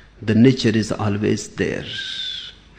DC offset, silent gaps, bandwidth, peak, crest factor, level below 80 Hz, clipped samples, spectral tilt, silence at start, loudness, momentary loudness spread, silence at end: under 0.1%; none; 9.8 kHz; -2 dBFS; 18 dB; -48 dBFS; under 0.1%; -6 dB/octave; 0.2 s; -20 LUFS; 11 LU; 0.3 s